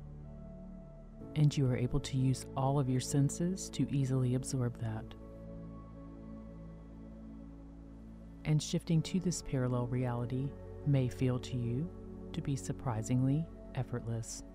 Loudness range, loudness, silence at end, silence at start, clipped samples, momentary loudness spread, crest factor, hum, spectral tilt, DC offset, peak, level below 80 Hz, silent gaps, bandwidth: 10 LU; -35 LUFS; 0 s; 0 s; under 0.1%; 19 LU; 16 dB; none; -6.5 dB/octave; under 0.1%; -18 dBFS; -52 dBFS; none; 14.5 kHz